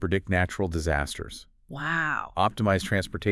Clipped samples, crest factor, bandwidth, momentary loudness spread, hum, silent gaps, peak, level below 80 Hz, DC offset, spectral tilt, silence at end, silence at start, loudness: under 0.1%; 18 dB; 12 kHz; 12 LU; none; none; -8 dBFS; -44 dBFS; under 0.1%; -5.5 dB/octave; 0 s; 0 s; -27 LUFS